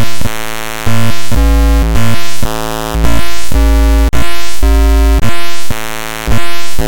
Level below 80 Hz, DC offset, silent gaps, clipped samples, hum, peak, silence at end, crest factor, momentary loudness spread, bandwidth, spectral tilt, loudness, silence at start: -12 dBFS; 40%; none; 0.4%; none; 0 dBFS; 0 s; 8 dB; 9 LU; 17.5 kHz; -5 dB/octave; -14 LUFS; 0 s